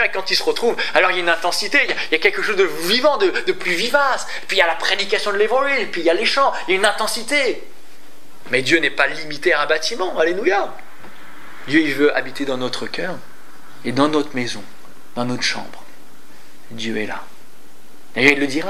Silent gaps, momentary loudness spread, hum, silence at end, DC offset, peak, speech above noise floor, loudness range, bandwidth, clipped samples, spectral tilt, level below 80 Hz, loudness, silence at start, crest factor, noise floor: none; 12 LU; none; 0 s; 5%; 0 dBFS; 29 dB; 7 LU; 16 kHz; under 0.1%; -3 dB/octave; -68 dBFS; -18 LUFS; 0 s; 20 dB; -48 dBFS